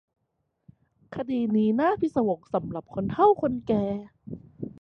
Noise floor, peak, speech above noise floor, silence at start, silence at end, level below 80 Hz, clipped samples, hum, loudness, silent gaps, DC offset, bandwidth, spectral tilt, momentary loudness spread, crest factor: -77 dBFS; -8 dBFS; 52 dB; 1.1 s; 0.1 s; -58 dBFS; under 0.1%; none; -26 LUFS; none; under 0.1%; 6 kHz; -9.5 dB/octave; 19 LU; 18 dB